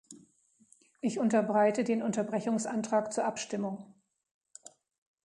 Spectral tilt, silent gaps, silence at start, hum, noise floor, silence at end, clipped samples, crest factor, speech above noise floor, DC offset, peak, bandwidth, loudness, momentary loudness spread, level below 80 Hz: -5 dB/octave; 4.31-4.41 s; 0.1 s; none; -66 dBFS; 0.6 s; under 0.1%; 18 dB; 36 dB; under 0.1%; -14 dBFS; 11 kHz; -31 LUFS; 16 LU; -78 dBFS